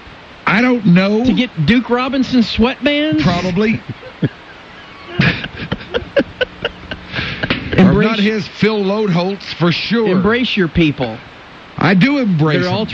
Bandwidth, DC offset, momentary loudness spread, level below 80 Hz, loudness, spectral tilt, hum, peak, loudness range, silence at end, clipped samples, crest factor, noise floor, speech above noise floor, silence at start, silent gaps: 7.4 kHz; under 0.1%; 12 LU; -38 dBFS; -15 LUFS; -7 dB/octave; none; -2 dBFS; 6 LU; 0 s; under 0.1%; 14 dB; -36 dBFS; 22 dB; 0 s; none